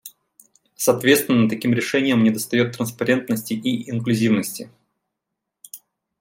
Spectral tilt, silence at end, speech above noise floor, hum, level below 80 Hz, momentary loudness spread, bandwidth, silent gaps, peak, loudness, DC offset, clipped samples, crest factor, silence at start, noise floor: -5 dB/octave; 0.45 s; 62 dB; none; -64 dBFS; 21 LU; 16.5 kHz; none; -2 dBFS; -20 LUFS; under 0.1%; under 0.1%; 20 dB; 0.05 s; -81 dBFS